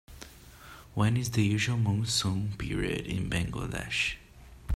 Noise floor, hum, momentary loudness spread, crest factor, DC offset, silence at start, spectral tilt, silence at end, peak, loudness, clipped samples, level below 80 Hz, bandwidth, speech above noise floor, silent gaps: -50 dBFS; none; 21 LU; 18 dB; under 0.1%; 0.1 s; -4.5 dB/octave; 0 s; -12 dBFS; -30 LUFS; under 0.1%; -46 dBFS; 15 kHz; 21 dB; none